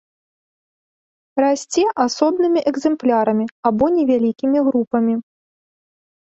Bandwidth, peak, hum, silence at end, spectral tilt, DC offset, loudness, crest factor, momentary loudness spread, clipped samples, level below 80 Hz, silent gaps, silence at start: 8.2 kHz; -4 dBFS; none; 1.1 s; -5 dB/octave; under 0.1%; -18 LUFS; 16 dB; 3 LU; under 0.1%; -56 dBFS; 3.51-3.63 s, 4.87-4.91 s; 1.35 s